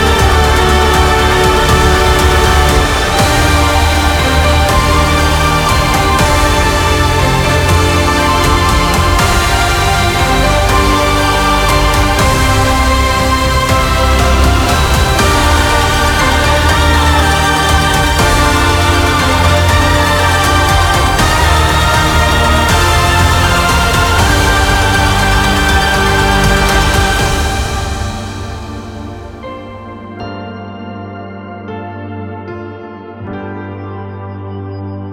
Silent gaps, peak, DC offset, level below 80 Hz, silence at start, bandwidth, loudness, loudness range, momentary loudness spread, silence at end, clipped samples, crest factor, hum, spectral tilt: none; 0 dBFS; under 0.1%; -16 dBFS; 0 s; 19.5 kHz; -10 LUFS; 15 LU; 16 LU; 0 s; under 0.1%; 10 dB; none; -4 dB/octave